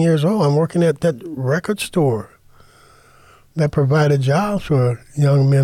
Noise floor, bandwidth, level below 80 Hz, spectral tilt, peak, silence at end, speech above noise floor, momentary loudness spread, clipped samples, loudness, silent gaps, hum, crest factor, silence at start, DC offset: -49 dBFS; 13.5 kHz; -48 dBFS; -7.5 dB/octave; -6 dBFS; 0 s; 32 dB; 6 LU; under 0.1%; -18 LUFS; none; none; 12 dB; 0 s; under 0.1%